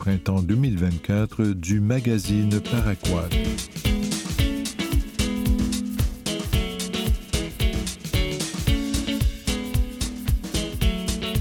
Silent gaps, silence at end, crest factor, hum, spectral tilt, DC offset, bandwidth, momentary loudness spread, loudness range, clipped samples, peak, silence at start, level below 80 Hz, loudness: none; 0 s; 16 dB; none; -5 dB/octave; under 0.1%; 19 kHz; 5 LU; 3 LU; under 0.1%; -8 dBFS; 0 s; -28 dBFS; -25 LUFS